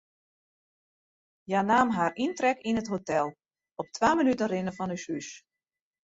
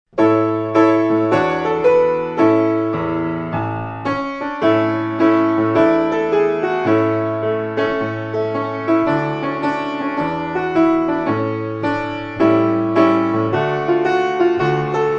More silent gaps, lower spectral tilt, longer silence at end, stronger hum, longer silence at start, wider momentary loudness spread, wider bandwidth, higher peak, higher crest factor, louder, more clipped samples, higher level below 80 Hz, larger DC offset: neither; second, -5 dB/octave vs -8 dB/octave; first, 0.65 s vs 0 s; neither; first, 1.5 s vs 0.15 s; first, 13 LU vs 7 LU; first, 8 kHz vs 7 kHz; second, -10 dBFS vs 0 dBFS; about the same, 20 dB vs 16 dB; second, -28 LUFS vs -17 LUFS; neither; second, -64 dBFS vs -50 dBFS; neither